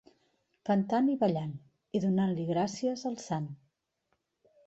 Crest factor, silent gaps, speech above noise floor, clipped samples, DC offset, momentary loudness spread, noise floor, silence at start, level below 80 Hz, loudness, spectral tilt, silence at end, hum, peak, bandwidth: 16 dB; none; 50 dB; under 0.1%; under 0.1%; 14 LU; -80 dBFS; 0.65 s; -72 dBFS; -31 LUFS; -7 dB/octave; 1.1 s; none; -16 dBFS; 8 kHz